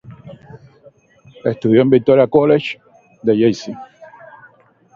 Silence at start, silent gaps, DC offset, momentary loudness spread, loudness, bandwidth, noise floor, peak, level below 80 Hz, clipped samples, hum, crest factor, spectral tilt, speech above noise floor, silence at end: 0.1 s; none; under 0.1%; 17 LU; -15 LUFS; 7.4 kHz; -50 dBFS; 0 dBFS; -56 dBFS; under 0.1%; none; 18 dB; -7.5 dB/octave; 37 dB; 0.9 s